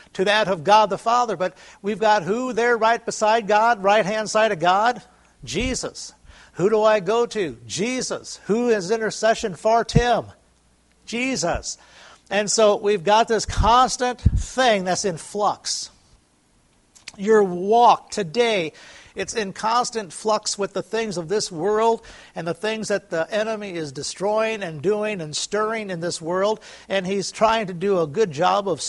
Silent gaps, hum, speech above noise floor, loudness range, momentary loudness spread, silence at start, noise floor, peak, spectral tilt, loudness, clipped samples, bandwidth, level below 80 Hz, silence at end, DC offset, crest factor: none; none; 39 dB; 5 LU; 11 LU; 0.15 s; -60 dBFS; -2 dBFS; -4 dB/octave; -21 LUFS; under 0.1%; 11.5 kHz; -40 dBFS; 0 s; under 0.1%; 20 dB